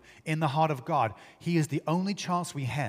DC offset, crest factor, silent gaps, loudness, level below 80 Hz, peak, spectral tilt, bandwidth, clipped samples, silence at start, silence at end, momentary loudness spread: under 0.1%; 18 dB; none; -30 LUFS; -68 dBFS; -12 dBFS; -6 dB/octave; 15.5 kHz; under 0.1%; 0.1 s; 0 s; 6 LU